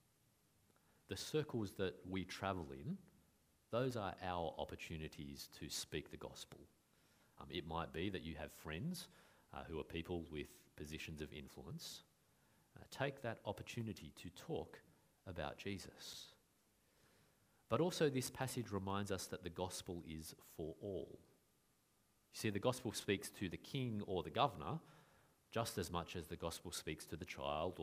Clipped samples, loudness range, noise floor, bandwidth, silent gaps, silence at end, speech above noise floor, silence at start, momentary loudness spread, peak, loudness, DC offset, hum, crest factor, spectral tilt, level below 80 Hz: under 0.1%; 7 LU; -78 dBFS; 15.5 kHz; none; 0 s; 33 dB; 1.1 s; 14 LU; -20 dBFS; -46 LUFS; under 0.1%; none; 26 dB; -5 dB/octave; -66 dBFS